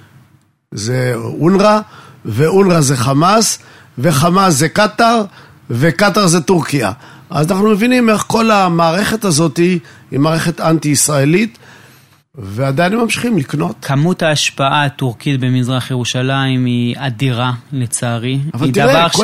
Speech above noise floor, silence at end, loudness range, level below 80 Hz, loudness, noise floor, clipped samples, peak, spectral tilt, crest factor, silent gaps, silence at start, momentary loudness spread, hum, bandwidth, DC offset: 38 dB; 0 s; 4 LU; -48 dBFS; -13 LUFS; -51 dBFS; under 0.1%; 0 dBFS; -5 dB/octave; 14 dB; none; 0.7 s; 9 LU; none; 16 kHz; under 0.1%